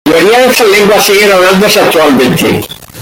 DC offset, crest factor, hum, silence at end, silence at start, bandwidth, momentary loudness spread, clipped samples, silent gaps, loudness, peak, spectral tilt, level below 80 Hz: under 0.1%; 6 dB; none; 0 s; 0.05 s; 17.5 kHz; 6 LU; 0.3%; none; -5 LUFS; 0 dBFS; -3.5 dB/octave; -38 dBFS